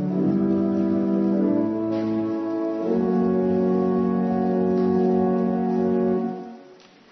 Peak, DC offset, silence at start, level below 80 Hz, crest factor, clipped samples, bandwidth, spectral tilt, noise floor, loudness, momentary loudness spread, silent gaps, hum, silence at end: -10 dBFS; under 0.1%; 0 s; -60 dBFS; 12 dB; under 0.1%; 6 kHz; -10.5 dB/octave; -49 dBFS; -22 LUFS; 5 LU; none; none; 0.4 s